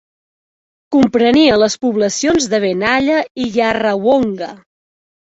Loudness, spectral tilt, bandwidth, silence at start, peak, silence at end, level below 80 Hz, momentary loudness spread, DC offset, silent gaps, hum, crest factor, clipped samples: -14 LUFS; -4 dB/octave; 8.2 kHz; 0.9 s; -2 dBFS; 0.7 s; -48 dBFS; 8 LU; under 0.1%; 3.30-3.35 s; none; 14 dB; under 0.1%